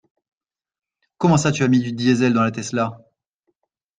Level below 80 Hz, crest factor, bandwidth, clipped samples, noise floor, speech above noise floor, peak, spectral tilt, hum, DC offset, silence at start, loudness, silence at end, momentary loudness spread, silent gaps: -56 dBFS; 18 dB; 9.6 kHz; under 0.1%; -73 dBFS; 55 dB; -4 dBFS; -6 dB/octave; none; under 0.1%; 1.2 s; -19 LUFS; 1 s; 7 LU; none